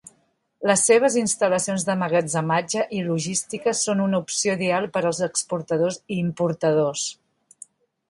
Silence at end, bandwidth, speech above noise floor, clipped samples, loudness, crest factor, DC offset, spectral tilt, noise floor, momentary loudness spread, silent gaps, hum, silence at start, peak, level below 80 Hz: 0.95 s; 11.5 kHz; 44 dB; under 0.1%; -22 LUFS; 18 dB; under 0.1%; -4 dB/octave; -66 dBFS; 7 LU; none; none; 0.6 s; -6 dBFS; -66 dBFS